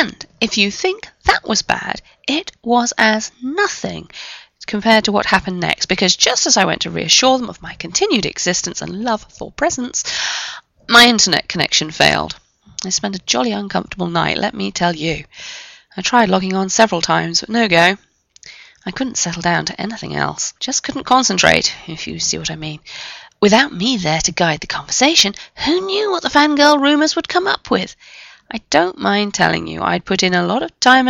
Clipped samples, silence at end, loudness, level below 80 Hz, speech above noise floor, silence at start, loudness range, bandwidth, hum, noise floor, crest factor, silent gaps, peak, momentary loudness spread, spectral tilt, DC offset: under 0.1%; 0 s; -15 LUFS; -46 dBFS; 26 dB; 0 s; 5 LU; 16 kHz; none; -43 dBFS; 16 dB; none; 0 dBFS; 16 LU; -2.5 dB/octave; under 0.1%